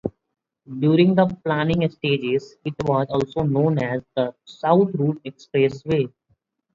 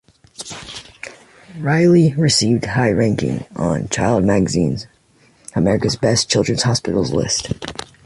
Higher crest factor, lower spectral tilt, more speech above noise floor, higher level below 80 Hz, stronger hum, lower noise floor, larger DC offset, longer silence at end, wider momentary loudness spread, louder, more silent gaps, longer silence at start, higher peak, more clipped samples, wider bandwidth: about the same, 18 dB vs 16 dB; first, -8.5 dB/octave vs -5 dB/octave; first, 47 dB vs 37 dB; second, -52 dBFS vs -42 dBFS; neither; first, -68 dBFS vs -54 dBFS; neither; first, 0.65 s vs 0.25 s; second, 10 LU vs 18 LU; second, -21 LUFS vs -17 LUFS; neither; second, 0.05 s vs 0.4 s; about the same, -4 dBFS vs -2 dBFS; neither; second, 7.4 kHz vs 11.5 kHz